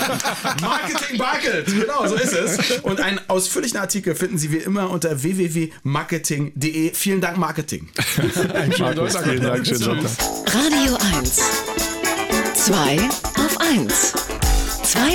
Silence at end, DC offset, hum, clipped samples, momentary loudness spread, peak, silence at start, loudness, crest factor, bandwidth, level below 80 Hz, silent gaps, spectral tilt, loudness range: 0 s; under 0.1%; none; under 0.1%; 6 LU; -6 dBFS; 0 s; -19 LUFS; 12 dB; 19.5 kHz; -34 dBFS; none; -3.5 dB/octave; 4 LU